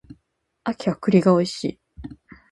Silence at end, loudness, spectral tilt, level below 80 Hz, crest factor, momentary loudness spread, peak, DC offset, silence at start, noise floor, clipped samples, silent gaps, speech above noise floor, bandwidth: 0.4 s; -21 LUFS; -7 dB/octave; -52 dBFS; 20 dB; 24 LU; -2 dBFS; under 0.1%; 0.1 s; -70 dBFS; under 0.1%; none; 50 dB; 11.5 kHz